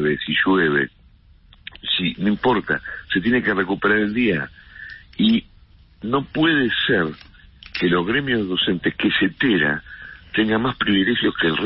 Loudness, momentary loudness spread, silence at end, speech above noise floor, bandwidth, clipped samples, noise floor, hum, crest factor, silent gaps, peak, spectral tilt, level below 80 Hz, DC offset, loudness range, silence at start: -20 LUFS; 14 LU; 0 s; 31 dB; 5.8 kHz; under 0.1%; -51 dBFS; none; 14 dB; none; -8 dBFS; -10 dB/octave; -48 dBFS; under 0.1%; 2 LU; 0 s